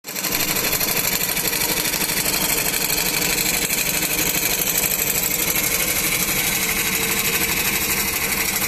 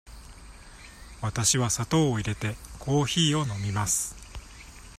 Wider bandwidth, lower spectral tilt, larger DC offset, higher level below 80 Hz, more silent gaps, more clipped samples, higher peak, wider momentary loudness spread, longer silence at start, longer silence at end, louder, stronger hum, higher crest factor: about the same, 16 kHz vs 15 kHz; second, -1 dB/octave vs -4 dB/octave; neither; first, -42 dBFS vs -48 dBFS; neither; neither; first, -2 dBFS vs -10 dBFS; second, 1 LU vs 23 LU; about the same, 0.05 s vs 0.05 s; about the same, 0 s vs 0 s; first, -18 LUFS vs -26 LUFS; neither; about the same, 18 dB vs 20 dB